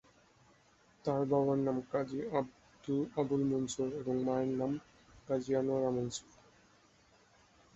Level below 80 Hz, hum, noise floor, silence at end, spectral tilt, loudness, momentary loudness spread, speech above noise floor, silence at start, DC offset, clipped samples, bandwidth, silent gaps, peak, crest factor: -68 dBFS; none; -67 dBFS; 1.55 s; -7 dB/octave; -35 LUFS; 9 LU; 33 dB; 1.05 s; under 0.1%; under 0.1%; 8 kHz; none; -18 dBFS; 18 dB